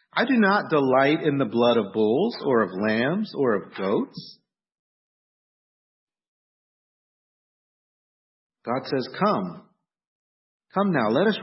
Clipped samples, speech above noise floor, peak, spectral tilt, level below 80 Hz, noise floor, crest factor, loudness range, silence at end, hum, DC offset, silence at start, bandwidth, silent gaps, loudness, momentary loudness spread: under 0.1%; over 68 dB; -8 dBFS; -10 dB/octave; -72 dBFS; under -90 dBFS; 18 dB; 13 LU; 0 s; none; under 0.1%; 0.15 s; 5.8 kHz; 4.79-6.07 s, 6.28-8.50 s, 10.07-10.60 s; -23 LUFS; 10 LU